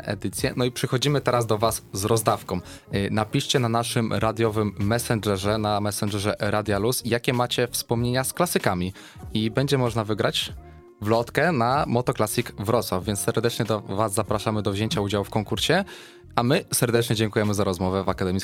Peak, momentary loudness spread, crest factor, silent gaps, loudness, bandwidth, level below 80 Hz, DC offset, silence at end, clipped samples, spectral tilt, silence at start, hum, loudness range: -2 dBFS; 5 LU; 22 dB; none; -24 LUFS; 16.5 kHz; -48 dBFS; under 0.1%; 0 s; under 0.1%; -5 dB/octave; 0 s; none; 1 LU